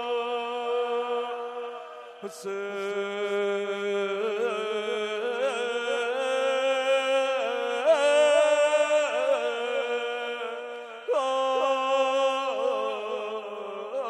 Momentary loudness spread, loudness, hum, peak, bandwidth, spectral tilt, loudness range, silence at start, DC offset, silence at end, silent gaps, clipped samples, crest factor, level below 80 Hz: 13 LU; -27 LUFS; none; -10 dBFS; 12 kHz; -2 dB/octave; 7 LU; 0 s; under 0.1%; 0 s; none; under 0.1%; 16 dB; under -90 dBFS